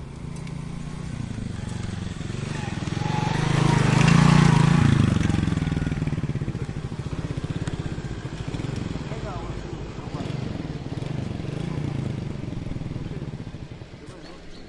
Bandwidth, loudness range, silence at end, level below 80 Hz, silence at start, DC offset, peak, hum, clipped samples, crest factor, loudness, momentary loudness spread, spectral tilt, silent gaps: 11.5 kHz; 12 LU; 0 s; -38 dBFS; 0 s; under 0.1%; -6 dBFS; none; under 0.1%; 20 dB; -25 LUFS; 16 LU; -6.5 dB/octave; none